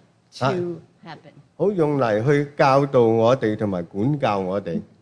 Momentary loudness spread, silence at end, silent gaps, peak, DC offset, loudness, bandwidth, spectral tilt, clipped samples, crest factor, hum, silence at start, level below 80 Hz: 13 LU; 0.15 s; none; -4 dBFS; under 0.1%; -21 LUFS; 10.5 kHz; -7.5 dB/octave; under 0.1%; 16 dB; none; 0.35 s; -60 dBFS